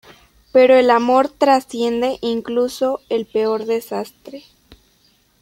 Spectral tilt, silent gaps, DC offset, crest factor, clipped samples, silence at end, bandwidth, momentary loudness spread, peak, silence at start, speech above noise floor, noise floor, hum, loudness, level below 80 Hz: -4.5 dB/octave; none; under 0.1%; 16 dB; under 0.1%; 1 s; 16 kHz; 15 LU; -2 dBFS; 0.55 s; 41 dB; -58 dBFS; none; -17 LUFS; -58 dBFS